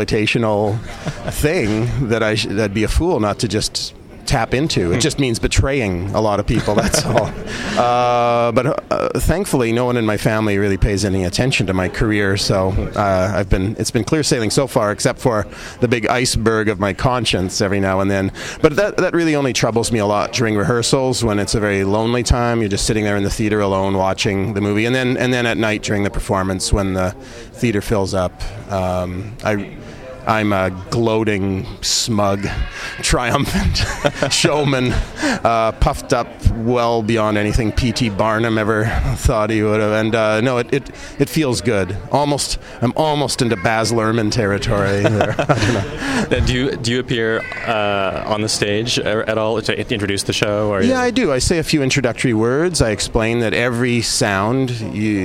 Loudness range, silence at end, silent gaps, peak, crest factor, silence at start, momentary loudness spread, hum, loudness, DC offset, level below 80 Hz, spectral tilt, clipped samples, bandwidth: 2 LU; 0 s; none; 0 dBFS; 18 dB; 0 s; 5 LU; none; -17 LUFS; under 0.1%; -30 dBFS; -5 dB/octave; under 0.1%; 16 kHz